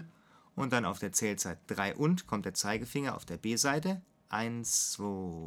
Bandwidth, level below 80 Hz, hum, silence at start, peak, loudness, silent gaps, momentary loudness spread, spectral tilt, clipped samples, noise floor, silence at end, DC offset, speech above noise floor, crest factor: 18 kHz; -64 dBFS; none; 0 s; -14 dBFS; -33 LUFS; none; 8 LU; -3.5 dB/octave; under 0.1%; -62 dBFS; 0 s; under 0.1%; 28 dB; 22 dB